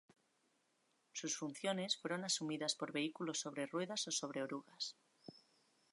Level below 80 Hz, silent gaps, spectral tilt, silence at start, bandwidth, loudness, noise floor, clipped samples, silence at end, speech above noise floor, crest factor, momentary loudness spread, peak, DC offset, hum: under -90 dBFS; none; -2.5 dB/octave; 1.15 s; 11.5 kHz; -42 LUFS; -80 dBFS; under 0.1%; 0.55 s; 37 dB; 20 dB; 11 LU; -24 dBFS; under 0.1%; none